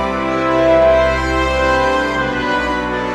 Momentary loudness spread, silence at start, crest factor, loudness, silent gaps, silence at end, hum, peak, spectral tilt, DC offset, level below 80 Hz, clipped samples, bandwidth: 6 LU; 0 s; 14 dB; -15 LUFS; none; 0 s; none; -2 dBFS; -5.5 dB/octave; under 0.1%; -28 dBFS; under 0.1%; 12 kHz